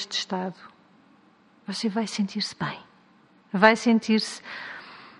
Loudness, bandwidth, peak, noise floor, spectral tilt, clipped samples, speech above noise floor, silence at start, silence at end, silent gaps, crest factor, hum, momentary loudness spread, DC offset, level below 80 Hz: -25 LUFS; 11 kHz; 0 dBFS; -58 dBFS; -4.5 dB/octave; under 0.1%; 33 dB; 0 s; 0.1 s; none; 26 dB; none; 19 LU; under 0.1%; -72 dBFS